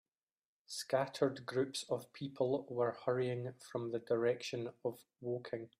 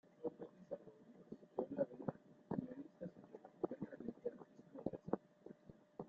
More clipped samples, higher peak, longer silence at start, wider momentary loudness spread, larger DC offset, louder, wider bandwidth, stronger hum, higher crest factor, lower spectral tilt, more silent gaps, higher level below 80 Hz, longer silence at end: neither; first, -20 dBFS vs -24 dBFS; first, 0.7 s vs 0.05 s; second, 9 LU vs 17 LU; neither; first, -39 LUFS vs -49 LUFS; first, 15.5 kHz vs 7.4 kHz; neither; about the same, 20 dB vs 24 dB; second, -5.5 dB/octave vs -9.5 dB/octave; neither; about the same, -82 dBFS vs -80 dBFS; first, 0.15 s vs 0 s